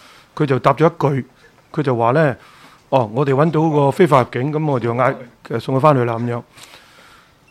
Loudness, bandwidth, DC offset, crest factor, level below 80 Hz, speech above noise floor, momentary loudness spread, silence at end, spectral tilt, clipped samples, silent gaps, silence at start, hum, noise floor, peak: -17 LUFS; 13.5 kHz; under 0.1%; 18 dB; -58 dBFS; 31 dB; 13 LU; 0.85 s; -8 dB/octave; under 0.1%; none; 0.35 s; none; -48 dBFS; 0 dBFS